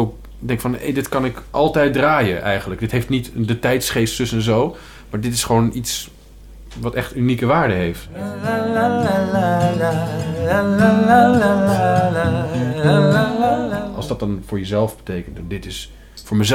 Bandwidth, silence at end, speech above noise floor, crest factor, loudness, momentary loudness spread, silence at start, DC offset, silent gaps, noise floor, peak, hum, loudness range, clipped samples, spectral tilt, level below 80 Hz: 17.5 kHz; 0 s; 22 dB; 16 dB; -18 LUFS; 14 LU; 0 s; under 0.1%; none; -39 dBFS; -2 dBFS; none; 5 LU; under 0.1%; -5.5 dB/octave; -40 dBFS